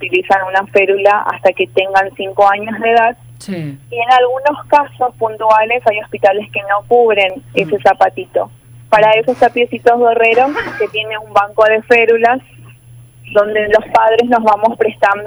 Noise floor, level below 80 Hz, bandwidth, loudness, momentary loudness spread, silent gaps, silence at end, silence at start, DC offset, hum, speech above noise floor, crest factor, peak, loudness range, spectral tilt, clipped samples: -39 dBFS; -50 dBFS; over 20 kHz; -12 LUFS; 9 LU; none; 0 s; 0 s; under 0.1%; none; 27 dB; 12 dB; 0 dBFS; 2 LU; -5 dB/octave; under 0.1%